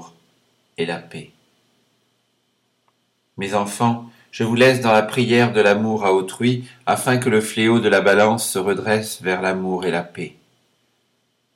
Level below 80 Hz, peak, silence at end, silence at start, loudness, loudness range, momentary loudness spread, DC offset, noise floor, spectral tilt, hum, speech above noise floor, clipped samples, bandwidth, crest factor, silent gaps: -68 dBFS; 0 dBFS; 1.25 s; 0 s; -18 LUFS; 11 LU; 15 LU; under 0.1%; -67 dBFS; -5 dB/octave; none; 49 dB; under 0.1%; 16.5 kHz; 20 dB; none